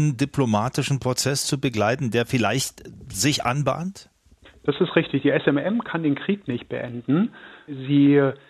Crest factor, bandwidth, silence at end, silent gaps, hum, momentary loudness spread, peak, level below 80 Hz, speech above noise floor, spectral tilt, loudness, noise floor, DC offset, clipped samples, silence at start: 20 dB; 14 kHz; 0.15 s; none; none; 10 LU; -2 dBFS; -56 dBFS; 30 dB; -5 dB/octave; -23 LUFS; -53 dBFS; under 0.1%; under 0.1%; 0 s